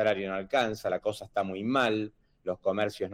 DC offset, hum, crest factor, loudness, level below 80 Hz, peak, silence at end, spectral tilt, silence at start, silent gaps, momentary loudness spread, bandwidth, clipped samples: under 0.1%; none; 16 dB; -30 LUFS; -64 dBFS; -14 dBFS; 0 s; -5.5 dB/octave; 0 s; none; 8 LU; 16.5 kHz; under 0.1%